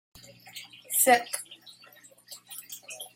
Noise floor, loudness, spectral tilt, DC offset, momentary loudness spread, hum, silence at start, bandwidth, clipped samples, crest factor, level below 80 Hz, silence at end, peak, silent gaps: -55 dBFS; -24 LUFS; -0.5 dB/octave; under 0.1%; 25 LU; 60 Hz at -65 dBFS; 0.45 s; 16.5 kHz; under 0.1%; 22 dB; -76 dBFS; 0.1 s; -8 dBFS; none